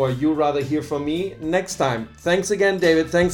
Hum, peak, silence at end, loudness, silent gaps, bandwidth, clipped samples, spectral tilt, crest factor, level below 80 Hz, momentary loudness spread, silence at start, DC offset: none; -6 dBFS; 0 s; -21 LUFS; none; 17.5 kHz; under 0.1%; -5 dB/octave; 16 dB; -48 dBFS; 7 LU; 0 s; under 0.1%